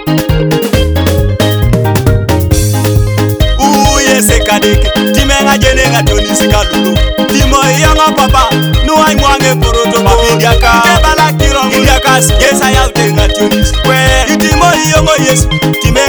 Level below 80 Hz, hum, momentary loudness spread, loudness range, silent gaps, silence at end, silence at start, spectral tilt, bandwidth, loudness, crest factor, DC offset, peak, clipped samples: -14 dBFS; none; 4 LU; 2 LU; none; 0 s; 0 s; -4 dB/octave; over 20 kHz; -8 LUFS; 8 dB; under 0.1%; 0 dBFS; 1%